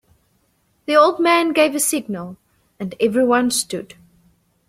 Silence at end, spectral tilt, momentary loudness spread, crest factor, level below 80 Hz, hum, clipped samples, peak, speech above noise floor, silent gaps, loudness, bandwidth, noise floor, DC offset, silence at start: 0.85 s; -3 dB/octave; 17 LU; 18 dB; -62 dBFS; none; under 0.1%; -2 dBFS; 46 dB; none; -17 LUFS; 16 kHz; -63 dBFS; under 0.1%; 0.9 s